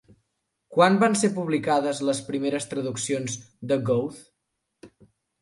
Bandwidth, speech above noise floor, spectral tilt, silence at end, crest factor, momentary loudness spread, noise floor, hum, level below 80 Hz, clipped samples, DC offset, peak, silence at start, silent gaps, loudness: 11.5 kHz; 55 dB; -5 dB/octave; 0.55 s; 20 dB; 10 LU; -79 dBFS; none; -68 dBFS; under 0.1%; under 0.1%; -6 dBFS; 0.7 s; none; -24 LUFS